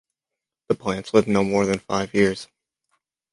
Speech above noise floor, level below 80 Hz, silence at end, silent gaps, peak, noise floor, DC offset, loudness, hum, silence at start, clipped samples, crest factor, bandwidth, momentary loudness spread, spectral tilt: 65 dB; -54 dBFS; 0.9 s; none; -4 dBFS; -87 dBFS; under 0.1%; -22 LUFS; none; 0.7 s; under 0.1%; 20 dB; 11.5 kHz; 7 LU; -5.5 dB/octave